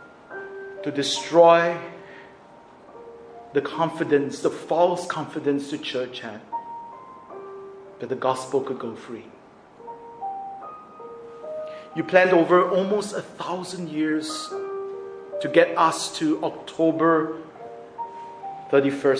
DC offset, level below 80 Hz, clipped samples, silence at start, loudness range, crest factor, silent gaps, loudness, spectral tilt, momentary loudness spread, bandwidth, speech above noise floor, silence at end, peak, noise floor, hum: under 0.1%; -70 dBFS; under 0.1%; 0 s; 9 LU; 22 dB; none; -23 LUFS; -4.5 dB/octave; 22 LU; 10.5 kHz; 26 dB; 0 s; -2 dBFS; -48 dBFS; none